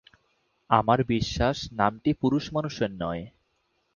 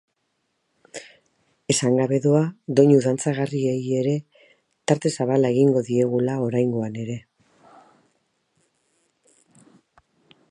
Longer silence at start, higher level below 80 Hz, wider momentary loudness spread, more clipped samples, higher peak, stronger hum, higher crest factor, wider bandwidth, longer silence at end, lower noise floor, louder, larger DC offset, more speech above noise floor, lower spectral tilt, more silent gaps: second, 0.7 s vs 0.95 s; first, -46 dBFS vs -68 dBFS; second, 10 LU vs 15 LU; neither; about the same, -4 dBFS vs -4 dBFS; neither; about the same, 24 dB vs 20 dB; second, 7.2 kHz vs 11.5 kHz; second, 0.65 s vs 3.3 s; about the same, -73 dBFS vs -73 dBFS; second, -26 LUFS vs -21 LUFS; neither; second, 47 dB vs 53 dB; about the same, -6.5 dB/octave vs -6 dB/octave; neither